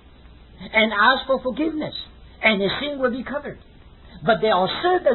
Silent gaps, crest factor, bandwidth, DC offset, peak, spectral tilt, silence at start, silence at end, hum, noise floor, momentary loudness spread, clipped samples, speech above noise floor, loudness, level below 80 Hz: none; 20 dB; 4.3 kHz; under 0.1%; -2 dBFS; -9.5 dB/octave; 0.6 s; 0 s; none; -46 dBFS; 14 LU; under 0.1%; 26 dB; -21 LUFS; -48 dBFS